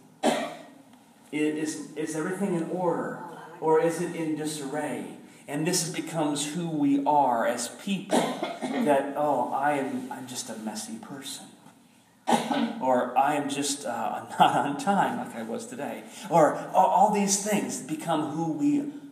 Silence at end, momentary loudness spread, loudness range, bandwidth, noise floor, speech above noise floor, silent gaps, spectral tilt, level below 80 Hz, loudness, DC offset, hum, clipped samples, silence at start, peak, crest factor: 0 s; 14 LU; 5 LU; 15.5 kHz; -58 dBFS; 31 dB; none; -4.5 dB/octave; -82 dBFS; -27 LUFS; under 0.1%; none; under 0.1%; 0.2 s; -6 dBFS; 22 dB